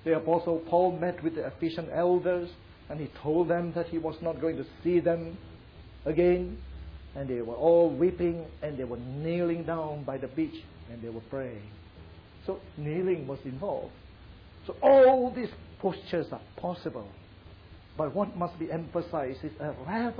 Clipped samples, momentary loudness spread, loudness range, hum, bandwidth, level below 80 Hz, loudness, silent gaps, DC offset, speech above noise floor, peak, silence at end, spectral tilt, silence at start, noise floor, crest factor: under 0.1%; 17 LU; 9 LU; none; 5.2 kHz; -52 dBFS; -29 LUFS; none; under 0.1%; 22 dB; -12 dBFS; 0 s; -6.5 dB/octave; 0 s; -51 dBFS; 18 dB